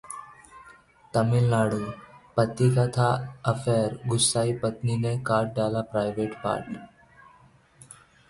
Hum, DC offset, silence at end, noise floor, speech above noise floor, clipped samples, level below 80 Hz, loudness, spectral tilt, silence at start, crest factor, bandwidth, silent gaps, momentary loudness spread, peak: none; under 0.1%; 1.45 s; -57 dBFS; 32 dB; under 0.1%; -56 dBFS; -26 LUFS; -5.5 dB/octave; 0.05 s; 20 dB; 11.5 kHz; none; 10 LU; -8 dBFS